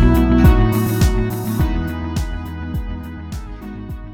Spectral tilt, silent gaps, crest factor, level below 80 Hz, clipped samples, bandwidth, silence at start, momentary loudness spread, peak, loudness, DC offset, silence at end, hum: -7 dB/octave; none; 16 dB; -20 dBFS; under 0.1%; 18.5 kHz; 0 s; 18 LU; -2 dBFS; -18 LUFS; under 0.1%; 0 s; none